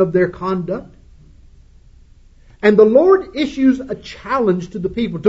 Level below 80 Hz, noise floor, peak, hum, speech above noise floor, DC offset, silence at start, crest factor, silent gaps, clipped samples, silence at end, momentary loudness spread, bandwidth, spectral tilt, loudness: -44 dBFS; -46 dBFS; 0 dBFS; none; 30 dB; under 0.1%; 0 s; 16 dB; none; under 0.1%; 0 s; 15 LU; 7.8 kHz; -7.5 dB/octave; -16 LUFS